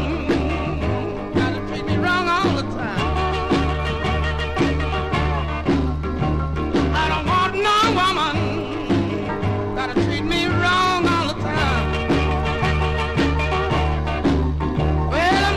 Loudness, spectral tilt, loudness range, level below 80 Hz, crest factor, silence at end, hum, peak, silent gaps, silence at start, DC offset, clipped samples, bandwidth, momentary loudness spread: -20 LUFS; -6 dB/octave; 2 LU; -28 dBFS; 14 dB; 0 s; none; -6 dBFS; none; 0 s; under 0.1%; under 0.1%; 12.5 kHz; 6 LU